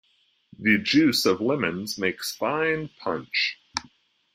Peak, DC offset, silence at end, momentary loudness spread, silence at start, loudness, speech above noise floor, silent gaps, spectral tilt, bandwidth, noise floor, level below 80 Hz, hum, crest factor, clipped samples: -6 dBFS; under 0.1%; 0.5 s; 11 LU; 0.6 s; -24 LUFS; 39 dB; none; -4 dB/octave; 16 kHz; -63 dBFS; -62 dBFS; none; 20 dB; under 0.1%